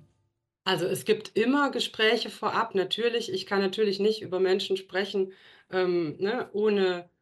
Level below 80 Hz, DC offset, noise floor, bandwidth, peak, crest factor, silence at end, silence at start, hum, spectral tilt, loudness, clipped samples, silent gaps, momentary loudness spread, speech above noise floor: -76 dBFS; under 0.1%; -76 dBFS; 12.5 kHz; -10 dBFS; 16 dB; 0.2 s; 0.65 s; none; -4.5 dB/octave; -27 LUFS; under 0.1%; none; 6 LU; 49 dB